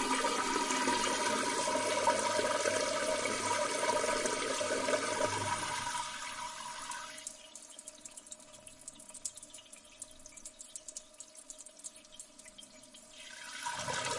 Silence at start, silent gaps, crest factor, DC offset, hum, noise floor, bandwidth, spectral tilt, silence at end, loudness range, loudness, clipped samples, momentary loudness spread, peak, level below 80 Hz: 0 s; none; 20 dB; under 0.1%; none; -56 dBFS; 11.5 kHz; -1.5 dB/octave; 0 s; 16 LU; -34 LUFS; under 0.1%; 19 LU; -16 dBFS; -66 dBFS